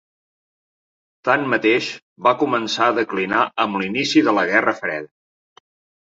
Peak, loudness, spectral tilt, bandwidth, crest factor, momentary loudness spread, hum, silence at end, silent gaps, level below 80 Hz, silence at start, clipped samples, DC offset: -2 dBFS; -19 LUFS; -4.5 dB/octave; 7.8 kHz; 18 dB; 9 LU; none; 0.95 s; 2.02-2.16 s; -64 dBFS; 1.25 s; under 0.1%; under 0.1%